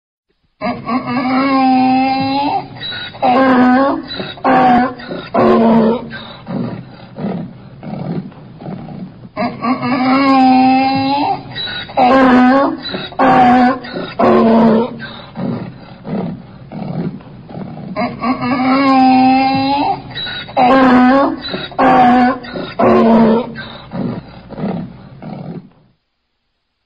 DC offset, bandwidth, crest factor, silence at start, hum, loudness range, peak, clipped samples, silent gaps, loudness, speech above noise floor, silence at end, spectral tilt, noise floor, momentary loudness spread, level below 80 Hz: 0.1%; 5.4 kHz; 12 dB; 0.6 s; none; 11 LU; -2 dBFS; under 0.1%; none; -13 LUFS; 56 dB; 1.25 s; -8 dB/octave; -68 dBFS; 20 LU; -46 dBFS